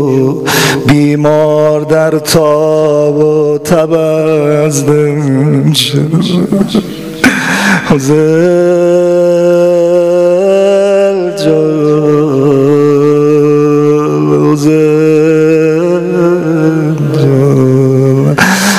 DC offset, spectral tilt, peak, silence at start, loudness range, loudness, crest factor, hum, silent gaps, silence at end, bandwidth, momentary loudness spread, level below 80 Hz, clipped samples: 0.5%; -6 dB/octave; 0 dBFS; 0 s; 2 LU; -8 LUFS; 8 dB; none; none; 0 s; 16 kHz; 3 LU; -44 dBFS; 0.3%